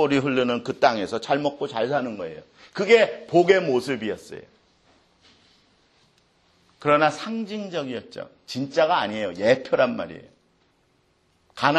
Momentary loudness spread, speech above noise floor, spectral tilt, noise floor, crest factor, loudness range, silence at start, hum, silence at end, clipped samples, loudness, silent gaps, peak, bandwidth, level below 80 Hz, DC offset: 18 LU; 42 dB; -5.5 dB/octave; -65 dBFS; 22 dB; 6 LU; 0 s; none; 0 s; under 0.1%; -23 LUFS; none; -2 dBFS; 12 kHz; -66 dBFS; under 0.1%